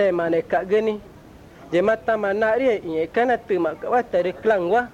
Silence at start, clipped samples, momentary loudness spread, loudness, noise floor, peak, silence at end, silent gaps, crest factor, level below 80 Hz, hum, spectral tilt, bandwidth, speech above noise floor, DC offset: 0 s; under 0.1%; 4 LU; -21 LUFS; -45 dBFS; -8 dBFS; 0 s; none; 14 dB; -54 dBFS; none; -6.5 dB/octave; 10 kHz; 24 dB; under 0.1%